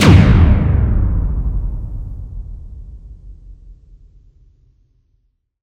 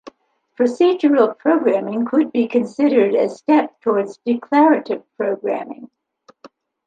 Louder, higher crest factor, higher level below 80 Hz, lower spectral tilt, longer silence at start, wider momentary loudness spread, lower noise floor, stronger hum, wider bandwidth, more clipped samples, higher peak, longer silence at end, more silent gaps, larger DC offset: first, -15 LUFS vs -18 LUFS; about the same, 16 dB vs 16 dB; first, -20 dBFS vs -72 dBFS; about the same, -7 dB/octave vs -6.5 dB/octave; about the same, 0 s vs 0.05 s; first, 27 LU vs 9 LU; first, -63 dBFS vs -48 dBFS; neither; first, 10 kHz vs 9 kHz; first, 0.2% vs under 0.1%; about the same, 0 dBFS vs -2 dBFS; first, 1.9 s vs 0.4 s; neither; neither